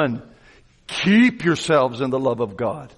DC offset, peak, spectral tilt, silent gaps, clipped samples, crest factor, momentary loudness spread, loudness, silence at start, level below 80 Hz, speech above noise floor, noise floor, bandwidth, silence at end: under 0.1%; -6 dBFS; -5.5 dB/octave; none; under 0.1%; 14 dB; 11 LU; -19 LUFS; 0 s; -54 dBFS; 32 dB; -52 dBFS; 11.5 kHz; 0.1 s